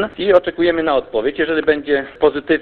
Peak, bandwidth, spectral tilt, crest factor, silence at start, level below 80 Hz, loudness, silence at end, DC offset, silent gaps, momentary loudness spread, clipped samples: 0 dBFS; 4.7 kHz; -7.5 dB/octave; 16 dB; 0 s; -46 dBFS; -17 LUFS; 0 s; under 0.1%; none; 4 LU; under 0.1%